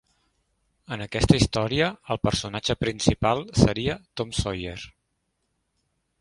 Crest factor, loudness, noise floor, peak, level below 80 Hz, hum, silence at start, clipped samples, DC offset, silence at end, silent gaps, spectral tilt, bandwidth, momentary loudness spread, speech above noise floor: 26 dB; -24 LUFS; -76 dBFS; 0 dBFS; -40 dBFS; none; 0.9 s; under 0.1%; under 0.1%; 1.3 s; none; -5 dB/octave; 11.5 kHz; 14 LU; 51 dB